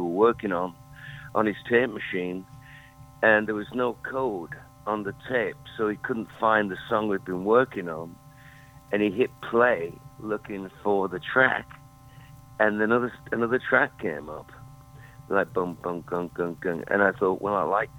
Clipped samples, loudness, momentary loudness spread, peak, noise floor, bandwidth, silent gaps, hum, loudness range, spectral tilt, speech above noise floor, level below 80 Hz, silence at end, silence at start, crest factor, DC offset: under 0.1%; -26 LUFS; 15 LU; -4 dBFS; -49 dBFS; 18.5 kHz; none; none; 3 LU; -7 dB/octave; 24 dB; -58 dBFS; 0 s; 0 s; 22 dB; under 0.1%